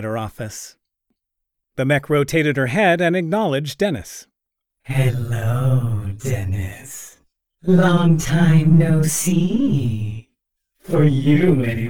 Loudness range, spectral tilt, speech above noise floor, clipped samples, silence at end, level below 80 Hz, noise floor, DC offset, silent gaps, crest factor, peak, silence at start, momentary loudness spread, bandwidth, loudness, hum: 6 LU; -6.5 dB/octave; 64 dB; under 0.1%; 0 s; -44 dBFS; -81 dBFS; under 0.1%; none; 14 dB; -4 dBFS; 0 s; 16 LU; 18.5 kHz; -18 LUFS; none